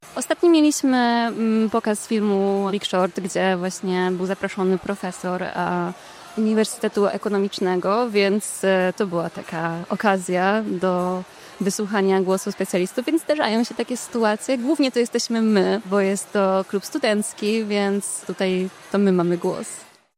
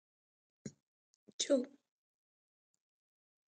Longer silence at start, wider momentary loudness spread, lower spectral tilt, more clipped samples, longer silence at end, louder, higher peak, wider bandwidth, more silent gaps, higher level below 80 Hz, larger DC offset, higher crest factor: second, 0.05 s vs 0.65 s; second, 8 LU vs 20 LU; first, -5 dB/octave vs -3 dB/octave; neither; second, 0.35 s vs 1.85 s; first, -22 LUFS vs -36 LUFS; first, -4 dBFS vs -20 dBFS; first, 16 kHz vs 8.8 kHz; second, none vs 0.82-1.27 s, 1.33-1.39 s; first, -66 dBFS vs under -90 dBFS; neither; second, 18 dB vs 24 dB